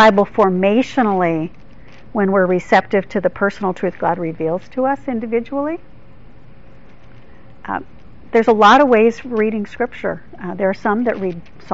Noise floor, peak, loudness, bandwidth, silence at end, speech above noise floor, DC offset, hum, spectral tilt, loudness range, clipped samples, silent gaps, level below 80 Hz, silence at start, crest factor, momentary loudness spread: -44 dBFS; 0 dBFS; -17 LUFS; 7.8 kHz; 0 s; 28 dB; 2%; none; -4.5 dB/octave; 9 LU; under 0.1%; none; -48 dBFS; 0 s; 16 dB; 15 LU